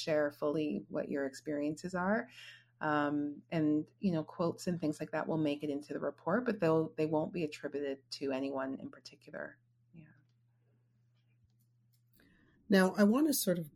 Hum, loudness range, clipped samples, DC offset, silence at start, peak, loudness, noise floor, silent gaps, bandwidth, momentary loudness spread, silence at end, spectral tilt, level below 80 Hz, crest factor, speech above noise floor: none; 11 LU; under 0.1%; under 0.1%; 0 s; -14 dBFS; -35 LUFS; -72 dBFS; none; 16 kHz; 14 LU; 0.05 s; -5.5 dB/octave; -74 dBFS; 20 dB; 38 dB